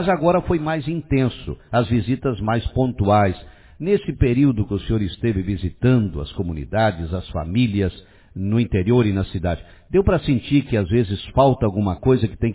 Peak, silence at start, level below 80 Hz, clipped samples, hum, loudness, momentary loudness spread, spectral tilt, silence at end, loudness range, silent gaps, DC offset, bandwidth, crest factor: -4 dBFS; 0 s; -34 dBFS; under 0.1%; none; -20 LUFS; 9 LU; -12 dB/octave; 0 s; 2 LU; none; under 0.1%; 4 kHz; 16 dB